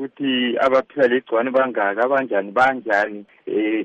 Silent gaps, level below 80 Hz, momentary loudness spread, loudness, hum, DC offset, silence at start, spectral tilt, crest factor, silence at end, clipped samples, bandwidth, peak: none; -64 dBFS; 5 LU; -19 LUFS; none; under 0.1%; 0 s; -5.5 dB/octave; 14 dB; 0 s; under 0.1%; 8.4 kHz; -6 dBFS